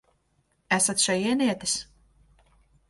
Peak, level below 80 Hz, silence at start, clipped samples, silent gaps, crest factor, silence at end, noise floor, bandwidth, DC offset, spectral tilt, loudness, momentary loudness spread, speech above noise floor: -8 dBFS; -62 dBFS; 0.7 s; under 0.1%; none; 20 dB; 1.05 s; -70 dBFS; 12 kHz; under 0.1%; -2.5 dB/octave; -24 LUFS; 7 LU; 45 dB